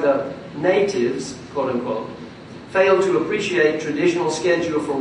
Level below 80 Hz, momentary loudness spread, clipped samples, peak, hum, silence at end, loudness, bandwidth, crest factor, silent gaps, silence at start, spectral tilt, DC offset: -60 dBFS; 12 LU; under 0.1%; -4 dBFS; none; 0 s; -20 LUFS; 10.5 kHz; 16 dB; none; 0 s; -5 dB/octave; under 0.1%